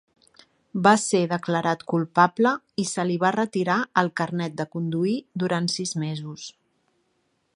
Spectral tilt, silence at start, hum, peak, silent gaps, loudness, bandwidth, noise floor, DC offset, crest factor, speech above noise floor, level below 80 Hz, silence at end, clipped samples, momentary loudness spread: -5 dB/octave; 0.75 s; none; -2 dBFS; none; -24 LUFS; 11.5 kHz; -71 dBFS; under 0.1%; 22 dB; 47 dB; -70 dBFS; 1.05 s; under 0.1%; 10 LU